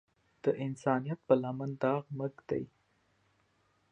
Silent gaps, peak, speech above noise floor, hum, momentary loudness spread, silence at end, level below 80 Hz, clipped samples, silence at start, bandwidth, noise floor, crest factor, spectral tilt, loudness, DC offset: none; -12 dBFS; 40 dB; none; 9 LU; 1.25 s; -72 dBFS; under 0.1%; 0.45 s; 9.2 kHz; -73 dBFS; 24 dB; -8.5 dB/octave; -34 LUFS; under 0.1%